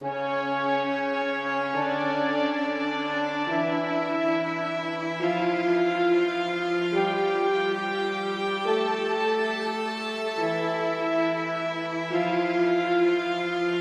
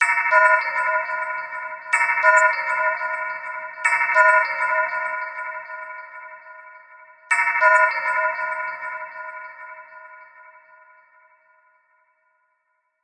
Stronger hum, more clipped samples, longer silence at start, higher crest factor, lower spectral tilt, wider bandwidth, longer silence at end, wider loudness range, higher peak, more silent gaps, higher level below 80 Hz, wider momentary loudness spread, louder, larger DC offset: neither; neither; about the same, 0 s vs 0 s; second, 14 dB vs 20 dB; first, -5.5 dB/octave vs 0.5 dB/octave; about the same, 9.4 kHz vs 9.8 kHz; second, 0 s vs 2.8 s; second, 2 LU vs 13 LU; second, -12 dBFS vs -2 dBFS; neither; first, -78 dBFS vs -88 dBFS; second, 5 LU vs 21 LU; second, -26 LUFS vs -19 LUFS; neither